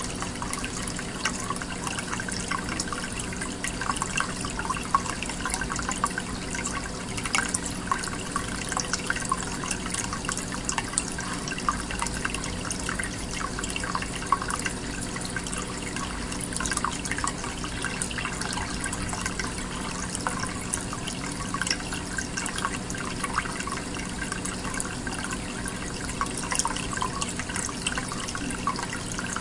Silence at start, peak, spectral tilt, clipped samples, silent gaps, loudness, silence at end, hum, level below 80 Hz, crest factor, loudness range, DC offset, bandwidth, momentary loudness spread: 0 s; -2 dBFS; -3 dB/octave; under 0.1%; none; -29 LUFS; 0 s; none; -42 dBFS; 28 dB; 2 LU; under 0.1%; 11.5 kHz; 5 LU